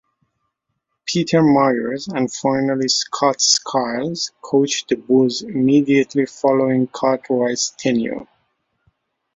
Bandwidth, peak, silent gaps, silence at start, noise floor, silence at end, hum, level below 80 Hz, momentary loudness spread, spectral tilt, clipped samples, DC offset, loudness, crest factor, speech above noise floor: 7.8 kHz; -2 dBFS; none; 1.05 s; -75 dBFS; 1.1 s; none; -62 dBFS; 8 LU; -4 dB/octave; under 0.1%; under 0.1%; -18 LUFS; 18 dB; 57 dB